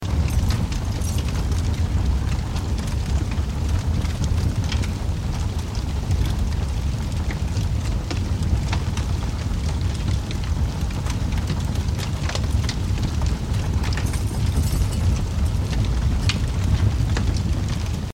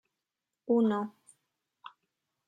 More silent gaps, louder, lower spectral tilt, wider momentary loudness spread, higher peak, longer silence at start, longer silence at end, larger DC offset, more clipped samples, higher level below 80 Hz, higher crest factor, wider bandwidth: neither; first, -24 LUFS vs -30 LUFS; second, -6 dB/octave vs -7.5 dB/octave; second, 4 LU vs 25 LU; first, -6 dBFS vs -16 dBFS; second, 0 s vs 0.7 s; second, 0 s vs 1.4 s; neither; neither; first, -24 dBFS vs -84 dBFS; about the same, 16 dB vs 18 dB; first, 16 kHz vs 9.8 kHz